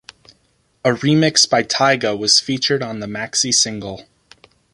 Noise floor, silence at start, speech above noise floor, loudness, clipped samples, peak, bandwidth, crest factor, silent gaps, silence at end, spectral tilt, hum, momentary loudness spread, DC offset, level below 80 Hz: -61 dBFS; 0.85 s; 44 dB; -16 LUFS; under 0.1%; 0 dBFS; 11.5 kHz; 18 dB; none; 0.7 s; -3 dB/octave; none; 12 LU; under 0.1%; -56 dBFS